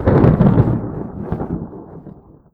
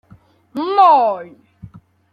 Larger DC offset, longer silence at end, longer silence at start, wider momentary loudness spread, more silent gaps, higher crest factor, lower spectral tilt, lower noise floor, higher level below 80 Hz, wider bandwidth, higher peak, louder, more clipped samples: neither; about the same, 0.45 s vs 0.45 s; second, 0 s vs 0.55 s; first, 24 LU vs 18 LU; neither; about the same, 16 dB vs 16 dB; first, -11.5 dB/octave vs -6.5 dB/octave; second, -40 dBFS vs -49 dBFS; first, -30 dBFS vs -60 dBFS; second, 4.6 kHz vs 5.6 kHz; about the same, 0 dBFS vs -2 dBFS; second, -17 LUFS vs -14 LUFS; neither